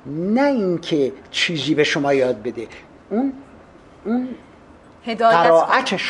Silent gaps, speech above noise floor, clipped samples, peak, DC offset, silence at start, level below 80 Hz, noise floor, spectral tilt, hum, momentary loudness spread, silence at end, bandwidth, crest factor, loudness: none; 27 dB; under 0.1%; 0 dBFS; under 0.1%; 0.05 s; -56 dBFS; -46 dBFS; -5 dB/octave; none; 19 LU; 0 s; 11.5 kHz; 18 dB; -19 LUFS